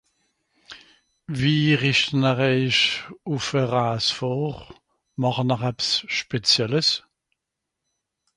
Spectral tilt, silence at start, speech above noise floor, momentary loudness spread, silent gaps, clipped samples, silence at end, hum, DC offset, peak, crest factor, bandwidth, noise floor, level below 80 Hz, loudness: -4.5 dB/octave; 0.7 s; 60 dB; 10 LU; none; under 0.1%; 1.35 s; none; under 0.1%; -6 dBFS; 18 dB; 11.5 kHz; -83 dBFS; -58 dBFS; -22 LUFS